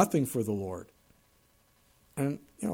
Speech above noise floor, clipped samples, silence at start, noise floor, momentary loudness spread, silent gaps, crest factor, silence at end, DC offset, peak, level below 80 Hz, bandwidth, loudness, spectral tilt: 36 dB; under 0.1%; 0 s; -66 dBFS; 15 LU; none; 22 dB; 0 s; under 0.1%; -10 dBFS; -66 dBFS; 18.5 kHz; -33 LUFS; -6.5 dB/octave